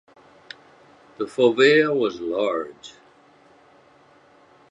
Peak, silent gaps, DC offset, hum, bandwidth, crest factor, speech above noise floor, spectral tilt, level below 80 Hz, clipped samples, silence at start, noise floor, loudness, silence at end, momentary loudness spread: -4 dBFS; none; under 0.1%; none; 10.5 kHz; 22 dB; 34 dB; -5 dB/octave; -70 dBFS; under 0.1%; 1.2 s; -54 dBFS; -20 LUFS; 1.8 s; 27 LU